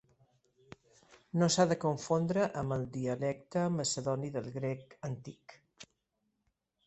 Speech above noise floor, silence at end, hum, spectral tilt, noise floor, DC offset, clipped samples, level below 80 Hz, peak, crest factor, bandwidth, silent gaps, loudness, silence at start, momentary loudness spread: 49 dB; 1 s; none; -5 dB/octave; -82 dBFS; under 0.1%; under 0.1%; -68 dBFS; -14 dBFS; 20 dB; 8.2 kHz; none; -34 LUFS; 1.35 s; 13 LU